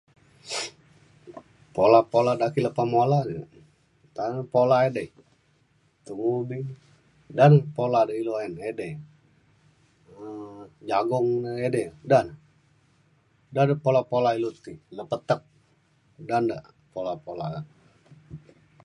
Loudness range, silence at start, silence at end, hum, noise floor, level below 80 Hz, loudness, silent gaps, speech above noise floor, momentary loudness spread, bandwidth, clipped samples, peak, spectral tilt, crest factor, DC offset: 7 LU; 0.45 s; 0.45 s; none; -65 dBFS; -64 dBFS; -25 LUFS; none; 41 dB; 21 LU; 11.5 kHz; under 0.1%; -4 dBFS; -7 dB/octave; 22 dB; under 0.1%